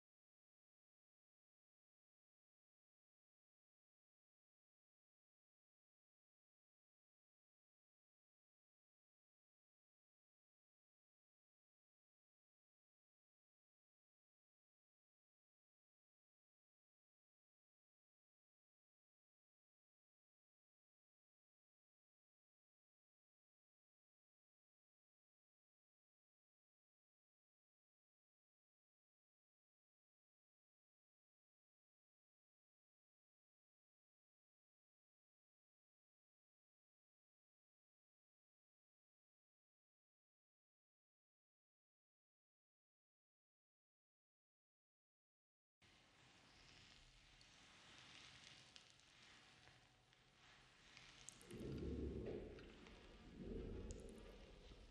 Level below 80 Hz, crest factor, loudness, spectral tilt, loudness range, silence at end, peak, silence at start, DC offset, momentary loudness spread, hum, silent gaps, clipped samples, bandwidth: -72 dBFS; 32 dB; -58 LUFS; -5.5 dB/octave; 11 LU; 0 s; -34 dBFS; 45.8 s; under 0.1%; 17 LU; none; none; under 0.1%; 10.5 kHz